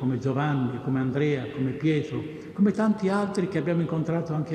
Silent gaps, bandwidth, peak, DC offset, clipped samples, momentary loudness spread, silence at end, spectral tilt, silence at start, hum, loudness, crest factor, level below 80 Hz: none; 9.6 kHz; -12 dBFS; under 0.1%; under 0.1%; 4 LU; 0 s; -8 dB/octave; 0 s; none; -26 LUFS; 14 dB; -62 dBFS